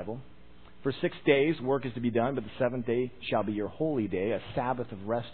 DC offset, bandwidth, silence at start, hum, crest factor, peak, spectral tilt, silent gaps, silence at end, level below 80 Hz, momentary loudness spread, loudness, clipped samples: 0.4%; 4.5 kHz; 0 s; none; 20 dB; -10 dBFS; -10.5 dB/octave; none; 0 s; -58 dBFS; 9 LU; -30 LUFS; under 0.1%